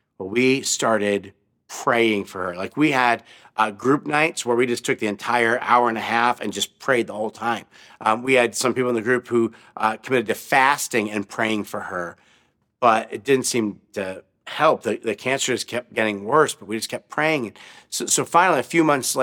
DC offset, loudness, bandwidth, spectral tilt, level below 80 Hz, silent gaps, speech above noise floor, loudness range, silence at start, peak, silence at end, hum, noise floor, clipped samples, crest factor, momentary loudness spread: under 0.1%; -21 LUFS; 18.5 kHz; -3.5 dB/octave; -72 dBFS; none; 41 dB; 2 LU; 0.2 s; -2 dBFS; 0 s; none; -62 dBFS; under 0.1%; 20 dB; 10 LU